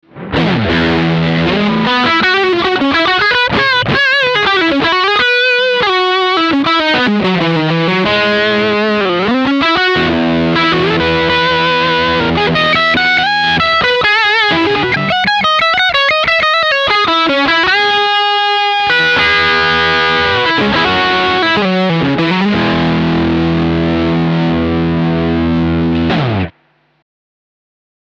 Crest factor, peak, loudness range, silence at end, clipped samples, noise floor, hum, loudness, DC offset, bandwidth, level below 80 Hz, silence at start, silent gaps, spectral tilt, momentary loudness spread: 10 dB; -2 dBFS; 3 LU; 1.5 s; under 0.1%; -55 dBFS; none; -11 LUFS; under 0.1%; 8.2 kHz; -36 dBFS; 0.15 s; none; -5.5 dB/octave; 4 LU